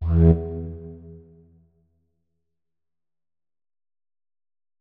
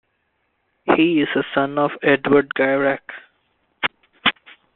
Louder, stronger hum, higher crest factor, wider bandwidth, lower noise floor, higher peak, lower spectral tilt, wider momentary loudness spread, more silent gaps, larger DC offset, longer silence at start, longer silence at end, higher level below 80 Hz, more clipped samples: about the same, -21 LUFS vs -19 LUFS; neither; about the same, 22 dB vs 20 dB; second, 2.6 kHz vs 4.2 kHz; first, under -90 dBFS vs -69 dBFS; second, -6 dBFS vs 0 dBFS; first, -13 dB/octave vs -2.5 dB/octave; first, 24 LU vs 14 LU; neither; neither; second, 0 s vs 0.85 s; first, 3.6 s vs 0.45 s; first, -34 dBFS vs -60 dBFS; neither